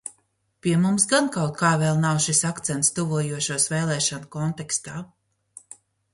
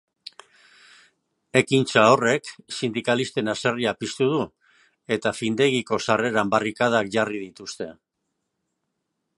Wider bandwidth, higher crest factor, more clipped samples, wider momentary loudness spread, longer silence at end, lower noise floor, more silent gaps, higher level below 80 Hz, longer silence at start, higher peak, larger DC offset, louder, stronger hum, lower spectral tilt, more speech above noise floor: about the same, 11.5 kHz vs 11.5 kHz; about the same, 20 dB vs 24 dB; neither; second, 11 LU vs 16 LU; second, 1.1 s vs 1.45 s; second, -68 dBFS vs -78 dBFS; neither; about the same, -60 dBFS vs -64 dBFS; second, 0.05 s vs 1.55 s; about the same, -4 dBFS vs -2 dBFS; neither; about the same, -22 LUFS vs -22 LUFS; neither; about the same, -4 dB/octave vs -4.5 dB/octave; second, 45 dB vs 56 dB